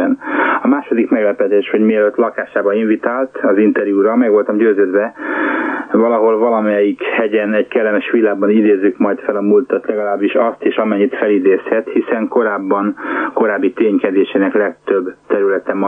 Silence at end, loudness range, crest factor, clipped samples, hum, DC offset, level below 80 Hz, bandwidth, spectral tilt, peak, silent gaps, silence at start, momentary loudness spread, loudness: 0 s; 2 LU; 12 dB; under 0.1%; none; under 0.1%; -66 dBFS; 3.7 kHz; -8.5 dB/octave; -2 dBFS; none; 0 s; 5 LU; -14 LUFS